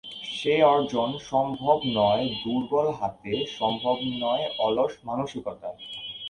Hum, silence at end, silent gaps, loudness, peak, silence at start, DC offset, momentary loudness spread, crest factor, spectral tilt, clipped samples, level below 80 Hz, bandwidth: none; 0 s; none; -26 LUFS; -6 dBFS; 0.05 s; under 0.1%; 13 LU; 18 dB; -5.5 dB/octave; under 0.1%; -60 dBFS; 9.8 kHz